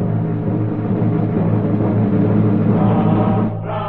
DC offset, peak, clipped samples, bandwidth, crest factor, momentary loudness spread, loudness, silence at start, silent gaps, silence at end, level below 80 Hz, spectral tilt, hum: under 0.1%; -4 dBFS; under 0.1%; 4 kHz; 12 dB; 5 LU; -17 LUFS; 0 s; none; 0 s; -40 dBFS; -12.5 dB/octave; none